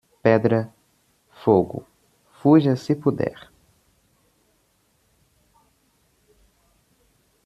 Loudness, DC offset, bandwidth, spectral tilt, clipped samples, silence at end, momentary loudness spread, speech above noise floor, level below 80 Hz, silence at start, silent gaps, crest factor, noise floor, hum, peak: -21 LUFS; under 0.1%; 11.5 kHz; -8.5 dB/octave; under 0.1%; 4.15 s; 13 LU; 47 dB; -62 dBFS; 0.25 s; none; 22 dB; -65 dBFS; none; -4 dBFS